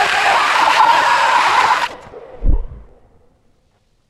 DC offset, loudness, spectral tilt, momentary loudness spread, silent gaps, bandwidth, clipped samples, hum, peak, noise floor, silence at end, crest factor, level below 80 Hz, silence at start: under 0.1%; -13 LUFS; -2.5 dB/octave; 13 LU; none; 14 kHz; under 0.1%; none; 0 dBFS; -58 dBFS; 1.3 s; 16 dB; -24 dBFS; 0 s